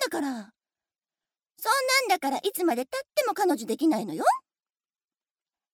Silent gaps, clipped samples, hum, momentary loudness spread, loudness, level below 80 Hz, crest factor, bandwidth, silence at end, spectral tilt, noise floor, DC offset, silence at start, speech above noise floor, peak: none; under 0.1%; none; 10 LU; -26 LUFS; -82 dBFS; 20 dB; 19.5 kHz; 1.35 s; -2.5 dB/octave; under -90 dBFS; under 0.1%; 0 s; over 64 dB; -10 dBFS